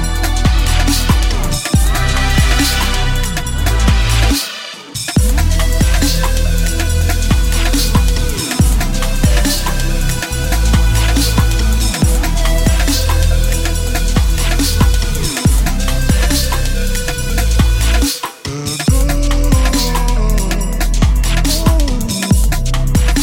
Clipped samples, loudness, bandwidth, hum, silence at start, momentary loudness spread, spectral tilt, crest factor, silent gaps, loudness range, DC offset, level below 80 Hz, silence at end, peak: under 0.1%; -15 LUFS; 17 kHz; none; 0 s; 5 LU; -4 dB/octave; 12 dB; none; 1 LU; under 0.1%; -14 dBFS; 0 s; 0 dBFS